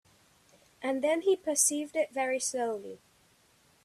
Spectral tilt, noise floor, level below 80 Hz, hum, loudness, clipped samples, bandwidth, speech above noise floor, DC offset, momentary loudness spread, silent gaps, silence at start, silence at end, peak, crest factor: -1 dB/octave; -65 dBFS; -78 dBFS; none; -30 LUFS; under 0.1%; 14 kHz; 35 dB; under 0.1%; 11 LU; none; 0.8 s; 0.9 s; -10 dBFS; 22 dB